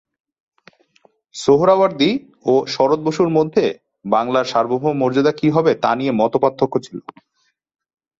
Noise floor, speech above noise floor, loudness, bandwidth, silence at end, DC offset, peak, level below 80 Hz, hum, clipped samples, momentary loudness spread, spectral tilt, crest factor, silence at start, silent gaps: -58 dBFS; 41 dB; -17 LUFS; 8 kHz; 1.2 s; under 0.1%; -2 dBFS; -58 dBFS; none; under 0.1%; 8 LU; -6 dB/octave; 16 dB; 1.35 s; none